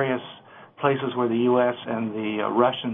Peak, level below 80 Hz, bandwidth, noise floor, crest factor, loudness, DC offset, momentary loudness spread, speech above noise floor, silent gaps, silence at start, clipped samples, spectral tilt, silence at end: -8 dBFS; -72 dBFS; 3.8 kHz; -46 dBFS; 16 dB; -24 LUFS; under 0.1%; 8 LU; 22 dB; none; 0 s; under 0.1%; -9.5 dB/octave; 0 s